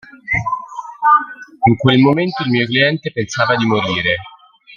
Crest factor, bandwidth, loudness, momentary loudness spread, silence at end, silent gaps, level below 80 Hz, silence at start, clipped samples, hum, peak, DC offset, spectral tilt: 16 dB; 7.4 kHz; -15 LUFS; 10 LU; 0 s; none; -48 dBFS; 0.25 s; under 0.1%; none; 0 dBFS; under 0.1%; -6 dB/octave